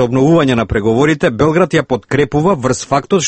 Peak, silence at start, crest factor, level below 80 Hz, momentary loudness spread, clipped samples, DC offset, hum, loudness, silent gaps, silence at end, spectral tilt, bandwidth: 0 dBFS; 0 s; 12 dB; -36 dBFS; 5 LU; under 0.1%; under 0.1%; none; -13 LUFS; none; 0 s; -5.5 dB/octave; 8.8 kHz